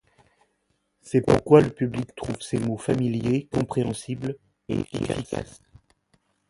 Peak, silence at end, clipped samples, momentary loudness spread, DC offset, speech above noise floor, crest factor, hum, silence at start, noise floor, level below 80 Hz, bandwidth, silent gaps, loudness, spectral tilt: 0 dBFS; 1.05 s; under 0.1%; 15 LU; under 0.1%; 49 dB; 24 dB; none; 1.05 s; -72 dBFS; -50 dBFS; 11.5 kHz; none; -25 LUFS; -7 dB/octave